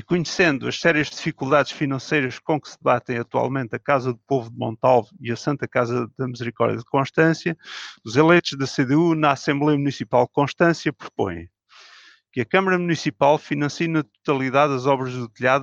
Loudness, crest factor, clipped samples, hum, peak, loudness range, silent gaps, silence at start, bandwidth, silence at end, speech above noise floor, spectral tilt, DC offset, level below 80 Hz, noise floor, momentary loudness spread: -21 LUFS; 18 dB; under 0.1%; none; -4 dBFS; 3 LU; none; 0.1 s; 7.8 kHz; 0 s; 29 dB; -6 dB/octave; under 0.1%; -62 dBFS; -50 dBFS; 9 LU